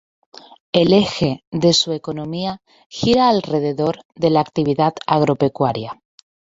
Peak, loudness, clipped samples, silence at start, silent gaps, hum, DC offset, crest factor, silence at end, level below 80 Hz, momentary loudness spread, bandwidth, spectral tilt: -2 dBFS; -18 LUFS; under 0.1%; 0.75 s; 1.47-1.52 s, 2.86-2.90 s, 4.05-4.09 s; none; under 0.1%; 18 dB; 0.65 s; -50 dBFS; 12 LU; 7.8 kHz; -5.5 dB/octave